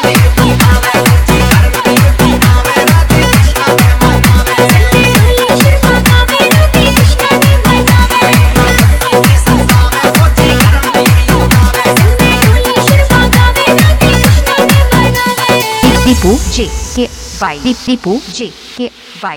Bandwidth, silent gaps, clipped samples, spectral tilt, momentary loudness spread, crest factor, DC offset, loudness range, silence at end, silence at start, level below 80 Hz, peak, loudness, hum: over 20 kHz; none; 2%; -5 dB/octave; 8 LU; 6 dB; under 0.1%; 3 LU; 0 s; 0 s; -14 dBFS; 0 dBFS; -7 LUFS; none